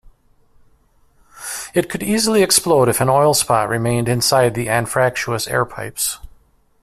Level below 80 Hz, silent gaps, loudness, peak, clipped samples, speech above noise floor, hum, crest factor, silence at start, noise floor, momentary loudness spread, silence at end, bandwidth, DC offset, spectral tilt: -48 dBFS; none; -17 LUFS; 0 dBFS; under 0.1%; 39 dB; none; 18 dB; 1.35 s; -55 dBFS; 9 LU; 0.55 s; 16 kHz; under 0.1%; -3.5 dB/octave